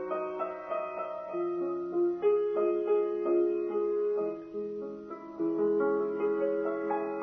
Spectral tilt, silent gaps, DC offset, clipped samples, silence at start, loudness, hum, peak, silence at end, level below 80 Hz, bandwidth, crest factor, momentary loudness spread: -9 dB/octave; none; under 0.1%; under 0.1%; 0 s; -31 LUFS; none; -18 dBFS; 0 s; -74 dBFS; 3.6 kHz; 14 dB; 9 LU